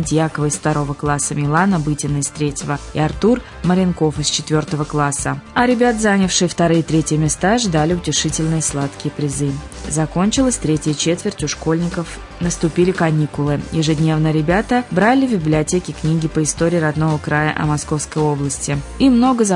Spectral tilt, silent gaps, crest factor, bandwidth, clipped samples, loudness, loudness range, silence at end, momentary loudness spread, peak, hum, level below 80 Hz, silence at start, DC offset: -5 dB/octave; none; 14 dB; 11 kHz; under 0.1%; -17 LUFS; 3 LU; 0 s; 7 LU; -2 dBFS; none; -36 dBFS; 0 s; under 0.1%